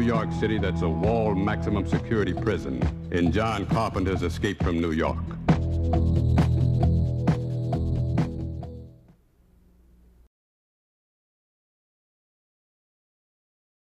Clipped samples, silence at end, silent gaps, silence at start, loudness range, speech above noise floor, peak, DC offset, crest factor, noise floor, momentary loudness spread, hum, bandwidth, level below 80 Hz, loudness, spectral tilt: under 0.1%; 5.05 s; none; 0 s; 8 LU; 35 dB; -8 dBFS; under 0.1%; 20 dB; -59 dBFS; 6 LU; none; 11 kHz; -36 dBFS; -25 LUFS; -8 dB/octave